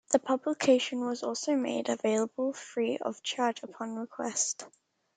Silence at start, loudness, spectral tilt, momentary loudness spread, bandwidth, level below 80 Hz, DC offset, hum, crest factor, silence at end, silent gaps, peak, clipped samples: 0.1 s; -31 LUFS; -2.5 dB/octave; 11 LU; 9.6 kHz; -82 dBFS; under 0.1%; none; 20 dB; 0.5 s; none; -10 dBFS; under 0.1%